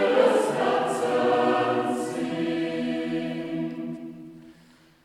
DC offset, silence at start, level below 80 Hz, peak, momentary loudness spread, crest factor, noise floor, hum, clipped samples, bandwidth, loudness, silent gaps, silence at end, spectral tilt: under 0.1%; 0 s; -70 dBFS; -6 dBFS; 14 LU; 20 dB; -56 dBFS; none; under 0.1%; 13.5 kHz; -25 LUFS; none; 0.5 s; -5.5 dB/octave